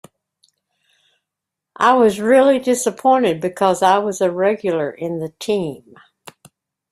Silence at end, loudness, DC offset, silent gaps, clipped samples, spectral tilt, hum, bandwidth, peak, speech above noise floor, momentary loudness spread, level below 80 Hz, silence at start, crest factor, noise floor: 1.15 s; -17 LUFS; under 0.1%; none; under 0.1%; -4.5 dB/octave; none; 15 kHz; -2 dBFS; 67 dB; 11 LU; -62 dBFS; 1.8 s; 18 dB; -83 dBFS